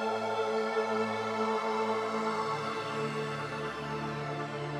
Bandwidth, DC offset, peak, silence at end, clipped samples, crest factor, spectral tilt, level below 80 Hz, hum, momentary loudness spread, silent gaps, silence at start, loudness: 12.5 kHz; under 0.1%; -18 dBFS; 0 s; under 0.1%; 14 dB; -5.5 dB/octave; -66 dBFS; none; 5 LU; none; 0 s; -33 LUFS